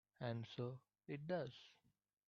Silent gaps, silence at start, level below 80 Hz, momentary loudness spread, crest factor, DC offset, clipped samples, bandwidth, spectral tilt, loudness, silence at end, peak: none; 0.2 s; -84 dBFS; 15 LU; 18 dB; under 0.1%; under 0.1%; 7 kHz; -6 dB/octave; -49 LUFS; 0.55 s; -30 dBFS